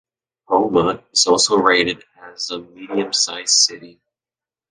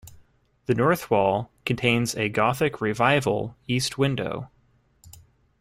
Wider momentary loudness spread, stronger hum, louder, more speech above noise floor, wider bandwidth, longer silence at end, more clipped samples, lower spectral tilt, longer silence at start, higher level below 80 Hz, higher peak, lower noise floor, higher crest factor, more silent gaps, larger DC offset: first, 13 LU vs 9 LU; neither; first, -16 LUFS vs -24 LUFS; first, over 72 dB vs 37 dB; second, 10 kHz vs 16 kHz; first, 0.8 s vs 0.5 s; neither; second, -1.5 dB/octave vs -5 dB/octave; first, 0.5 s vs 0.05 s; about the same, -56 dBFS vs -56 dBFS; first, 0 dBFS vs -6 dBFS; first, under -90 dBFS vs -61 dBFS; about the same, 20 dB vs 20 dB; neither; neither